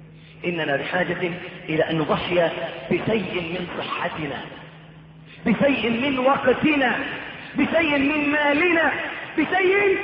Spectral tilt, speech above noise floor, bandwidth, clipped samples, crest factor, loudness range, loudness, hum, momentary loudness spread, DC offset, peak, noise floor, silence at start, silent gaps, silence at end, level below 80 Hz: -9.5 dB/octave; 23 dB; 5.6 kHz; under 0.1%; 16 dB; 5 LU; -22 LUFS; none; 11 LU; under 0.1%; -6 dBFS; -44 dBFS; 0 s; none; 0 s; -54 dBFS